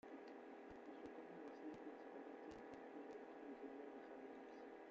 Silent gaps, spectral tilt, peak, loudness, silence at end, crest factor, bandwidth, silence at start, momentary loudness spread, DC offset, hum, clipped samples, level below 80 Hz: none; -4 dB/octave; -42 dBFS; -57 LUFS; 0 s; 14 dB; 7.4 kHz; 0.05 s; 3 LU; under 0.1%; none; under 0.1%; -86 dBFS